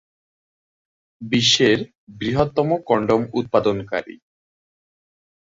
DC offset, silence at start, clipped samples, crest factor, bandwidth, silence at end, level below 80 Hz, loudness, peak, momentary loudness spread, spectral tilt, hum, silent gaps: under 0.1%; 1.2 s; under 0.1%; 20 dB; 7.8 kHz; 1.35 s; -52 dBFS; -19 LUFS; -2 dBFS; 13 LU; -4.5 dB/octave; none; 1.98-2.07 s